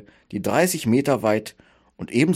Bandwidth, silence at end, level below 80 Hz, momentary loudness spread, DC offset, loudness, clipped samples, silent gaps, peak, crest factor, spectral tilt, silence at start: 16.5 kHz; 0 s; -58 dBFS; 16 LU; under 0.1%; -22 LUFS; under 0.1%; none; -6 dBFS; 16 dB; -5.5 dB/octave; 0.3 s